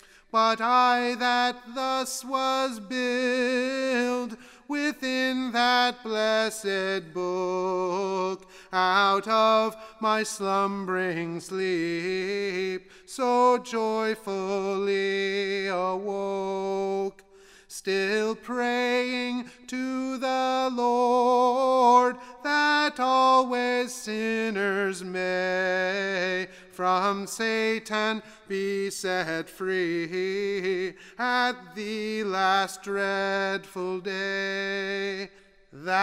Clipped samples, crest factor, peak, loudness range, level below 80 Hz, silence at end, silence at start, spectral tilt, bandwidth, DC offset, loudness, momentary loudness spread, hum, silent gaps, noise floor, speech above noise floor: under 0.1%; 18 dB; -8 dBFS; 6 LU; -66 dBFS; 0 s; 0.35 s; -3.5 dB/octave; 16 kHz; under 0.1%; -26 LUFS; 10 LU; none; none; -50 dBFS; 24 dB